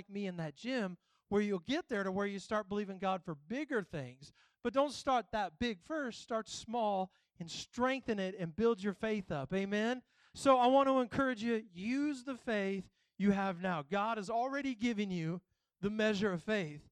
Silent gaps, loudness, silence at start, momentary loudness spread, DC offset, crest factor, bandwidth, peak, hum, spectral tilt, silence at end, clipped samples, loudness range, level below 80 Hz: none; -36 LUFS; 0.1 s; 9 LU; under 0.1%; 20 dB; 11 kHz; -16 dBFS; none; -5.5 dB/octave; 0.1 s; under 0.1%; 5 LU; -68 dBFS